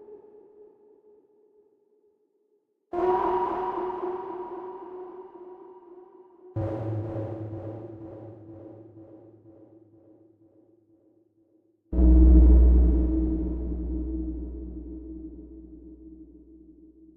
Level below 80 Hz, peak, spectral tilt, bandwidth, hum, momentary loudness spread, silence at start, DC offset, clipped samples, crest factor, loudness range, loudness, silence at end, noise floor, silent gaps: -28 dBFS; -6 dBFS; -12 dB/octave; 3 kHz; none; 28 LU; 0.1 s; under 0.1%; under 0.1%; 20 dB; 17 LU; -25 LUFS; 0.9 s; -71 dBFS; none